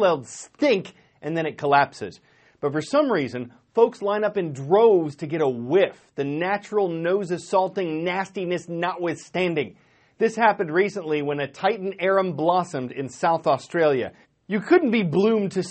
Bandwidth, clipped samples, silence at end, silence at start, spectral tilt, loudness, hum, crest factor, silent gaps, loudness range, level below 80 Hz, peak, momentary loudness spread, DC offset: 8.8 kHz; under 0.1%; 0 s; 0 s; -6 dB/octave; -23 LUFS; none; 18 dB; none; 3 LU; -68 dBFS; -4 dBFS; 10 LU; under 0.1%